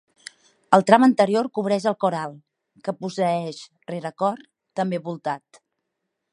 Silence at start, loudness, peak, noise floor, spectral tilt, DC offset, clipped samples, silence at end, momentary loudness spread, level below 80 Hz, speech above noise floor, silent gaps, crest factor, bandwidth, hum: 0.7 s; -22 LUFS; 0 dBFS; -80 dBFS; -6 dB/octave; under 0.1%; under 0.1%; 0.95 s; 19 LU; -72 dBFS; 58 dB; none; 22 dB; 11 kHz; none